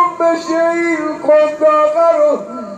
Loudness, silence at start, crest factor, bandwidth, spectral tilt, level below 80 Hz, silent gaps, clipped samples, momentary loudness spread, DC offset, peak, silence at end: -13 LUFS; 0 s; 12 dB; 9 kHz; -4.5 dB/octave; -64 dBFS; none; under 0.1%; 5 LU; under 0.1%; -2 dBFS; 0 s